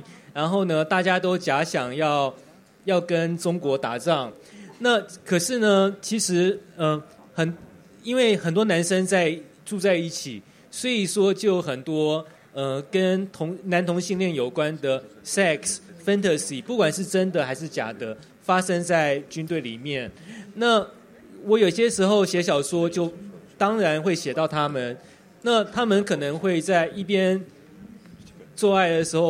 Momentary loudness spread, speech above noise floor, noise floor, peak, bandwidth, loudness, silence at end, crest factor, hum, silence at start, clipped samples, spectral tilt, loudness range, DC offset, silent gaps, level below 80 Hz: 11 LU; 24 dB; -46 dBFS; -6 dBFS; 15.5 kHz; -23 LUFS; 0 s; 18 dB; none; 0.1 s; under 0.1%; -4.5 dB/octave; 3 LU; under 0.1%; none; -66 dBFS